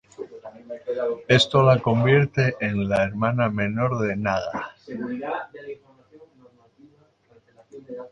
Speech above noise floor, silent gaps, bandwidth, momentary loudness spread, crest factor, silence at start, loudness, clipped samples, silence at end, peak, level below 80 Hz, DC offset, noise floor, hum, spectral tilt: 36 dB; none; 9.4 kHz; 21 LU; 20 dB; 0.2 s; -22 LUFS; under 0.1%; 0.05 s; -4 dBFS; -54 dBFS; under 0.1%; -58 dBFS; none; -6.5 dB/octave